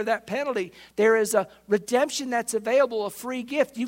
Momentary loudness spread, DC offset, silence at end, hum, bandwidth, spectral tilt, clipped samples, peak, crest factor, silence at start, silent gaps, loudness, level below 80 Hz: 9 LU; under 0.1%; 0 s; none; 16.5 kHz; -3.5 dB/octave; under 0.1%; -8 dBFS; 18 dB; 0 s; none; -25 LUFS; -68 dBFS